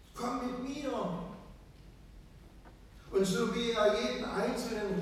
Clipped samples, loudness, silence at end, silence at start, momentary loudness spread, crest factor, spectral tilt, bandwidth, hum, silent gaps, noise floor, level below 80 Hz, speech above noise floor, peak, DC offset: under 0.1%; -33 LUFS; 0 s; 0 s; 12 LU; 18 dB; -5 dB/octave; 15.5 kHz; none; none; -54 dBFS; -56 dBFS; 22 dB; -16 dBFS; under 0.1%